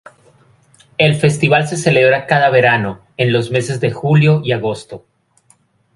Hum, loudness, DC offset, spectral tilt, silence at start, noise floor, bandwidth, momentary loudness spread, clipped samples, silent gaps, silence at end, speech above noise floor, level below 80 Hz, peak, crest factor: none; -14 LUFS; under 0.1%; -6 dB/octave; 1 s; -55 dBFS; 11.5 kHz; 11 LU; under 0.1%; none; 1 s; 41 dB; -52 dBFS; 0 dBFS; 16 dB